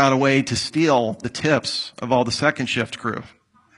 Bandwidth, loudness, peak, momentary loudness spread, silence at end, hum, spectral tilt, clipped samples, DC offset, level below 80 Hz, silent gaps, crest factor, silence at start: 11.5 kHz; -21 LUFS; -2 dBFS; 8 LU; 0.5 s; none; -4.5 dB/octave; under 0.1%; under 0.1%; -56 dBFS; none; 20 dB; 0 s